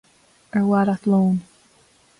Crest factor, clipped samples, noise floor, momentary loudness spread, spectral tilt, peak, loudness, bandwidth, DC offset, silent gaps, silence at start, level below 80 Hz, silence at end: 12 dB; under 0.1%; -57 dBFS; 8 LU; -9 dB/octave; -10 dBFS; -20 LUFS; 11 kHz; under 0.1%; none; 0.55 s; -62 dBFS; 0.8 s